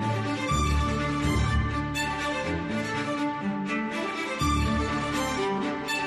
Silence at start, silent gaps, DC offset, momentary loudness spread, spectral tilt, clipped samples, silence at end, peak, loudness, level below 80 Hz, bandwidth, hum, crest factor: 0 s; none; under 0.1%; 4 LU; -5 dB/octave; under 0.1%; 0 s; -14 dBFS; -28 LUFS; -36 dBFS; 13 kHz; none; 14 dB